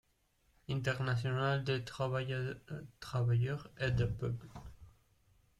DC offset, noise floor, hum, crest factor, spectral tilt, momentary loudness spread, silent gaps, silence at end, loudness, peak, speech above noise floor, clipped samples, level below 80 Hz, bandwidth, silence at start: under 0.1%; -74 dBFS; none; 16 dB; -6.5 dB/octave; 14 LU; none; 0.7 s; -37 LUFS; -22 dBFS; 39 dB; under 0.1%; -56 dBFS; 11.5 kHz; 0.7 s